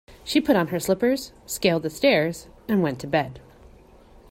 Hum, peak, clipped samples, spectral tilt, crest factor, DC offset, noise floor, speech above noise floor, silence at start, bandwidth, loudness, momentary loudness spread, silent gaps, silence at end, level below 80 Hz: none; -6 dBFS; under 0.1%; -5 dB/octave; 18 dB; under 0.1%; -50 dBFS; 28 dB; 0.1 s; 16.5 kHz; -23 LUFS; 9 LU; none; 0.9 s; -52 dBFS